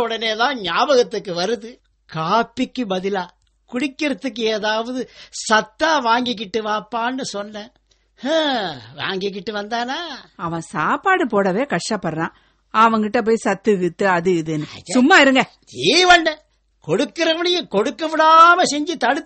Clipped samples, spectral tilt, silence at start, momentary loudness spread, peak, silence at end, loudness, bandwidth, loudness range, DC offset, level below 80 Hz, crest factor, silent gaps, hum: under 0.1%; -3.5 dB/octave; 0 s; 15 LU; 0 dBFS; 0.05 s; -18 LUFS; 8.8 kHz; 8 LU; under 0.1%; -56 dBFS; 18 dB; none; none